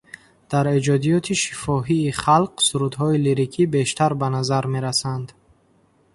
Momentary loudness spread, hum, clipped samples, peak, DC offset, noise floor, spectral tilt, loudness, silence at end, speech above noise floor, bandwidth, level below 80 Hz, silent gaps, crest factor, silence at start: 5 LU; none; under 0.1%; -4 dBFS; under 0.1%; -59 dBFS; -5 dB/octave; -20 LUFS; 0.9 s; 39 dB; 11.5 kHz; -52 dBFS; none; 18 dB; 0.5 s